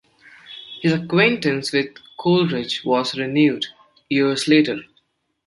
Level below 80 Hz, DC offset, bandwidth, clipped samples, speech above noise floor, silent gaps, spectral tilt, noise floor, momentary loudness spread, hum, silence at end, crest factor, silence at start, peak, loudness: -62 dBFS; under 0.1%; 11.5 kHz; under 0.1%; 46 dB; none; -5.5 dB/octave; -65 dBFS; 14 LU; none; 0.65 s; 18 dB; 0.5 s; -2 dBFS; -19 LUFS